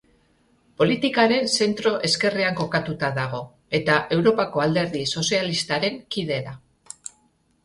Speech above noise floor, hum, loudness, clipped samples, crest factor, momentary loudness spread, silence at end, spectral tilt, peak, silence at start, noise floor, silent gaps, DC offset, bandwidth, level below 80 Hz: 42 dB; none; -22 LUFS; under 0.1%; 18 dB; 13 LU; 1.05 s; -4 dB/octave; -6 dBFS; 0.8 s; -64 dBFS; none; under 0.1%; 11.5 kHz; -58 dBFS